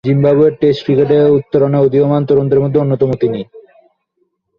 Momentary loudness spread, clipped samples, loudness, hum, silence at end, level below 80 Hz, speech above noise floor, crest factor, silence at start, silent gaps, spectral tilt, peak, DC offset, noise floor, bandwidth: 6 LU; under 0.1%; -12 LUFS; none; 1 s; -48 dBFS; 53 dB; 12 dB; 0.05 s; none; -10 dB/octave; 0 dBFS; under 0.1%; -65 dBFS; 5.4 kHz